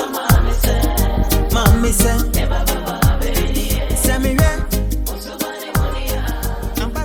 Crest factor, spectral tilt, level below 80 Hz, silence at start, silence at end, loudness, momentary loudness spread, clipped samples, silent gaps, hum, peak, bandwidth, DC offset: 16 dB; -4.5 dB/octave; -18 dBFS; 0 s; 0 s; -18 LUFS; 9 LU; under 0.1%; none; none; 0 dBFS; 19.5 kHz; under 0.1%